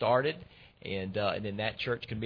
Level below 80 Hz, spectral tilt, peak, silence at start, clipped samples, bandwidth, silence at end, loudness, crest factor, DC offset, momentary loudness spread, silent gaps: -60 dBFS; -8 dB/octave; -14 dBFS; 0 s; under 0.1%; 5.4 kHz; 0 s; -33 LUFS; 20 dB; under 0.1%; 11 LU; none